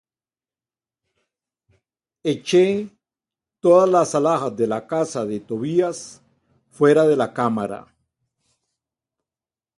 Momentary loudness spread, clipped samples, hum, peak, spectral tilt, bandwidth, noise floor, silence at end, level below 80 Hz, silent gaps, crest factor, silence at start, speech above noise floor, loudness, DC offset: 13 LU; under 0.1%; none; -4 dBFS; -6 dB/octave; 11.5 kHz; under -90 dBFS; 2 s; -66 dBFS; none; 18 dB; 2.25 s; over 71 dB; -20 LUFS; under 0.1%